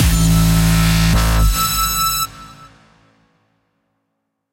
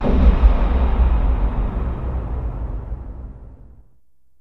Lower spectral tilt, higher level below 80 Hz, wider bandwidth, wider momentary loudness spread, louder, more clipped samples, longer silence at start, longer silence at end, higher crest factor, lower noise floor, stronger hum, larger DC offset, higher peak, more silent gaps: second, -4 dB/octave vs -10 dB/octave; about the same, -22 dBFS vs -18 dBFS; first, 16 kHz vs 4.2 kHz; second, 4 LU vs 18 LU; first, -15 LUFS vs -21 LUFS; neither; about the same, 0 s vs 0 s; first, 2.05 s vs 0.75 s; second, 12 dB vs 18 dB; first, -73 dBFS vs -64 dBFS; neither; second, under 0.1% vs 0.4%; second, -4 dBFS vs 0 dBFS; neither